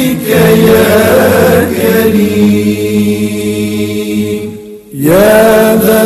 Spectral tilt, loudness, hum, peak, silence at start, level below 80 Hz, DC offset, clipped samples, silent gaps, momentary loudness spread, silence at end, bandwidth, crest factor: -5.5 dB/octave; -8 LUFS; none; 0 dBFS; 0 s; -36 dBFS; under 0.1%; 0.2%; none; 9 LU; 0 s; 14.5 kHz; 8 dB